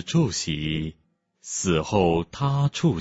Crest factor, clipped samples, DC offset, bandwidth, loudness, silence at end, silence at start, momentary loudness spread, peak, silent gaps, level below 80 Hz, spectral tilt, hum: 18 dB; under 0.1%; under 0.1%; 8 kHz; -24 LUFS; 0 s; 0 s; 10 LU; -6 dBFS; none; -46 dBFS; -5.5 dB/octave; none